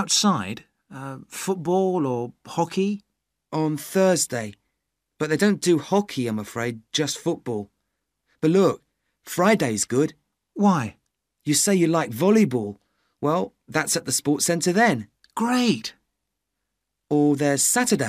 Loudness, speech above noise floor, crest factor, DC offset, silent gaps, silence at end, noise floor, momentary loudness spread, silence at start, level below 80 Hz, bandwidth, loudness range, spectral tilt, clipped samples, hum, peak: -22 LUFS; 58 dB; 18 dB; under 0.1%; none; 0 s; -80 dBFS; 15 LU; 0 s; -66 dBFS; 15.5 kHz; 4 LU; -4 dB/octave; under 0.1%; none; -4 dBFS